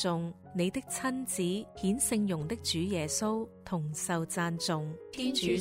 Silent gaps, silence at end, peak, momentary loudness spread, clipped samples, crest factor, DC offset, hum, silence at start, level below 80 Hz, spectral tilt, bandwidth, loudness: none; 0 s; -16 dBFS; 7 LU; under 0.1%; 16 dB; under 0.1%; none; 0 s; -60 dBFS; -4 dB/octave; 16 kHz; -33 LUFS